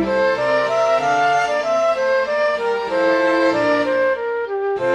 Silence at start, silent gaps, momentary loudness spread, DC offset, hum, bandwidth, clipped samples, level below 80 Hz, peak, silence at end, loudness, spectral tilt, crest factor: 0 s; none; 4 LU; under 0.1%; none; 10.5 kHz; under 0.1%; -54 dBFS; -6 dBFS; 0 s; -18 LUFS; -4.5 dB/octave; 12 dB